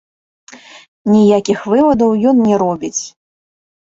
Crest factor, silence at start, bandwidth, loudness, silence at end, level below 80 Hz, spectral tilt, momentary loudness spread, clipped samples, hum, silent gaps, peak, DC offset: 12 dB; 0.5 s; 7.8 kHz; -13 LUFS; 0.8 s; -52 dBFS; -6 dB/octave; 12 LU; under 0.1%; none; 0.88-1.05 s; -2 dBFS; under 0.1%